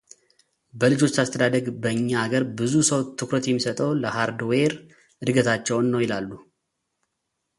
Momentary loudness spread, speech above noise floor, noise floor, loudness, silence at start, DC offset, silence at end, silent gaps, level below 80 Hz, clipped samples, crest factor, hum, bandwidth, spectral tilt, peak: 6 LU; 56 dB; -79 dBFS; -23 LUFS; 0.75 s; under 0.1%; 1.15 s; none; -62 dBFS; under 0.1%; 20 dB; none; 11.5 kHz; -4.5 dB/octave; -4 dBFS